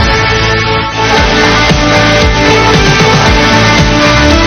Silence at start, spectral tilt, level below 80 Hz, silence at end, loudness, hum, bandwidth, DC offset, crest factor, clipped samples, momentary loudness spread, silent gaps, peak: 0 s; -4.5 dB/octave; -16 dBFS; 0 s; -7 LUFS; none; 13.5 kHz; under 0.1%; 6 dB; 2%; 3 LU; none; 0 dBFS